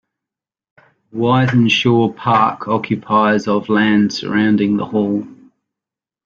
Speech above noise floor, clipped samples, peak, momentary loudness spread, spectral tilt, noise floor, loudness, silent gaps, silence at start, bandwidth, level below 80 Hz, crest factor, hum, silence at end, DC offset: 72 dB; under 0.1%; -2 dBFS; 7 LU; -6.5 dB/octave; -87 dBFS; -15 LUFS; none; 1.15 s; 7.2 kHz; -56 dBFS; 14 dB; none; 0.9 s; under 0.1%